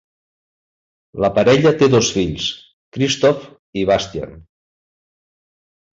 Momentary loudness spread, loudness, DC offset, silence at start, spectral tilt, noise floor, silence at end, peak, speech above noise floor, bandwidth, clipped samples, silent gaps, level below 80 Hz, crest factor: 19 LU; -16 LUFS; under 0.1%; 1.15 s; -4.5 dB/octave; under -90 dBFS; 1.5 s; -2 dBFS; over 74 dB; 7.8 kHz; under 0.1%; 2.73-2.92 s, 3.59-3.73 s; -46 dBFS; 18 dB